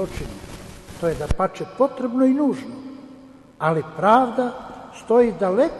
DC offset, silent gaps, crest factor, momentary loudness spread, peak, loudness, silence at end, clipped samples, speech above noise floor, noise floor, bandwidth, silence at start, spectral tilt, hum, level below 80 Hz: under 0.1%; none; 20 dB; 21 LU; -2 dBFS; -21 LUFS; 0 s; under 0.1%; 25 dB; -45 dBFS; 12.5 kHz; 0 s; -7 dB/octave; none; -40 dBFS